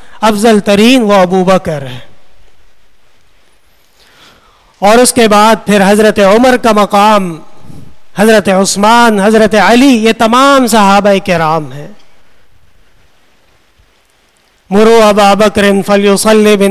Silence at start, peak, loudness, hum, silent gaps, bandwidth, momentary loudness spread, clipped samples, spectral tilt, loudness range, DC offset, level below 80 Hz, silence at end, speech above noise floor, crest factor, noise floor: 0 s; 0 dBFS; -7 LUFS; none; none; 15.5 kHz; 7 LU; 1%; -4.5 dB/octave; 10 LU; under 0.1%; -40 dBFS; 0 s; 44 dB; 8 dB; -50 dBFS